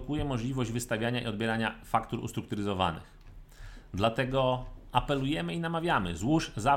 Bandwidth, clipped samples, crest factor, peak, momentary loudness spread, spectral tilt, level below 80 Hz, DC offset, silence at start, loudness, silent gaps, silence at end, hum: 16.5 kHz; under 0.1%; 20 dB; -10 dBFS; 8 LU; -5.5 dB/octave; -48 dBFS; under 0.1%; 0 s; -31 LUFS; none; 0 s; none